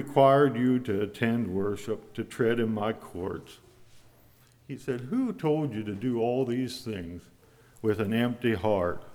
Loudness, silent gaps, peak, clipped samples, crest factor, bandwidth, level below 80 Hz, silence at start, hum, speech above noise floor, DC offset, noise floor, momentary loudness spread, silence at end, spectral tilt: -28 LUFS; none; -8 dBFS; under 0.1%; 20 dB; 16.5 kHz; -60 dBFS; 0 s; none; 31 dB; under 0.1%; -59 dBFS; 13 LU; 0 s; -7 dB/octave